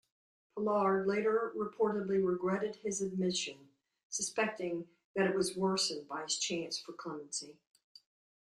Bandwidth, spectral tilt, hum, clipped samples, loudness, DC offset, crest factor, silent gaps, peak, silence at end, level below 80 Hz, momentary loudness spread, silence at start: 12.5 kHz; -3.5 dB/octave; none; under 0.1%; -35 LUFS; under 0.1%; 20 dB; 4.03-4.10 s, 5.04-5.14 s; -16 dBFS; 0.95 s; -76 dBFS; 10 LU; 0.55 s